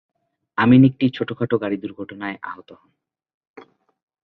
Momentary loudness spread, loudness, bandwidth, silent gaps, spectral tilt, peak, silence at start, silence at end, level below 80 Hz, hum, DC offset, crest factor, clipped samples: 20 LU; -19 LUFS; 4.5 kHz; none; -10 dB/octave; -2 dBFS; 0.6 s; 1.5 s; -58 dBFS; none; under 0.1%; 20 dB; under 0.1%